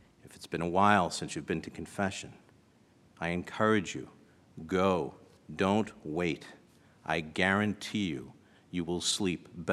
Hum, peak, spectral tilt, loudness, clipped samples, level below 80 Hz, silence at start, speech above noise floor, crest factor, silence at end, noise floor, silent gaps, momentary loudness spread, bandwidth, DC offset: none; -8 dBFS; -4.5 dB/octave; -32 LUFS; under 0.1%; -62 dBFS; 0.25 s; 32 dB; 24 dB; 0 s; -63 dBFS; none; 15 LU; 13.5 kHz; under 0.1%